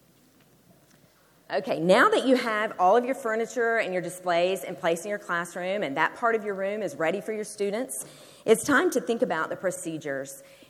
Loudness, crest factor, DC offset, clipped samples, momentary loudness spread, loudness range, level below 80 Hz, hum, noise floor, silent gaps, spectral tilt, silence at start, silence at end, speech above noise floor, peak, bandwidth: -26 LUFS; 20 dB; under 0.1%; under 0.1%; 12 LU; 5 LU; -74 dBFS; none; -60 dBFS; none; -4 dB/octave; 1.5 s; 0.3 s; 34 dB; -6 dBFS; 16 kHz